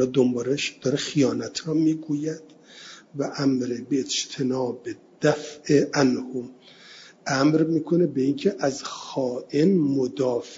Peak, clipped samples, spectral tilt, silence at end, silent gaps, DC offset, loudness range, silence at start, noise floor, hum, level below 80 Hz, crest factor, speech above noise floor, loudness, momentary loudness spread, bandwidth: -6 dBFS; under 0.1%; -5.5 dB/octave; 0 s; none; under 0.1%; 4 LU; 0 s; -48 dBFS; none; -66 dBFS; 18 dB; 24 dB; -24 LUFS; 15 LU; 7.8 kHz